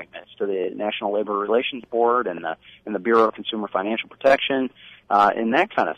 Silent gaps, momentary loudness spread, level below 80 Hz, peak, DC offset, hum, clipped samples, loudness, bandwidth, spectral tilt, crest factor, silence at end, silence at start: none; 12 LU; -64 dBFS; -6 dBFS; under 0.1%; none; under 0.1%; -22 LUFS; 9.4 kHz; -5.5 dB/octave; 16 dB; 0.05 s; 0 s